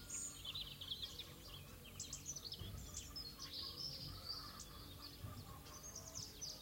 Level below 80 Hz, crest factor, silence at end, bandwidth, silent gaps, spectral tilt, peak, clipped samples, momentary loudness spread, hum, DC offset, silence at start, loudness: -62 dBFS; 18 dB; 0 s; 16.5 kHz; none; -2 dB/octave; -34 dBFS; under 0.1%; 8 LU; none; under 0.1%; 0 s; -49 LUFS